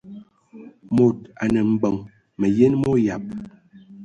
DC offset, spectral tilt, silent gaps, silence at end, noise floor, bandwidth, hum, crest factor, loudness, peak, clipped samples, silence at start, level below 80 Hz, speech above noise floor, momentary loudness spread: under 0.1%; -8.5 dB/octave; none; 0 s; -45 dBFS; 9.4 kHz; none; 18 dB; -21 LUFS; -4 dBFS; under 0.1%; 0.05 s; -52 dBFS; 26 dB; 17 LU